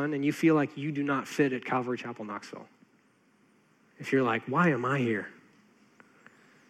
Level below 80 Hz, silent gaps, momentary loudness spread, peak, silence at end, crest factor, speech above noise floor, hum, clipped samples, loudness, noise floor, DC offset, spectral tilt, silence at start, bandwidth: -86 dBFS; none; 15 LU; -12 dBFS; 1.35 s; 18 dB; 37 dB; none; under 0.1%; -29 LUFS; -66 dBFS; under 0.1%; -6.5 dB/octave; 0 s; 14.5 kHz